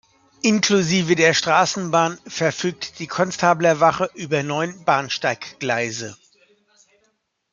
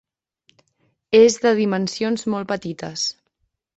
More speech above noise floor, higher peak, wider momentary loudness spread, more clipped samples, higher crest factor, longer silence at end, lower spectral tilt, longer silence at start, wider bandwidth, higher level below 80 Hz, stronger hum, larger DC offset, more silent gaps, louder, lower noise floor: second, 48 dB vs 54 dB; about the same, -2 dBFS vs -2 dBFS; about the same, 10 LU vs 12 LU; neither; about the same, 20 dB vs 18 dB; first, 1.4 s vs 0.65 s; about the same, -4 dB/octave vs -4 dB/octave; second, 0.45 s vs 1.1 s; first, 9.4 kHz vs 8.2 kHz; about the same, -62 dBFS vs -62 dBFS; neither; neither; neither; about the same, -20 LUFS vs -19 LUFS; second, -68 dBFS vs -72 dBFS